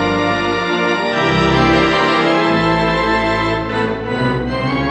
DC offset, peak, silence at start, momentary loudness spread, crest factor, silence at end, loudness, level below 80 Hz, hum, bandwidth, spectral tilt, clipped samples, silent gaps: under 0.1%; -2 dBFS; 0 s; 6 LU; 14 dB; 0 s; -15 LUFS; -34 dBFS; none; 9.8 kHz; -6 dB/octave; under 0.1%; none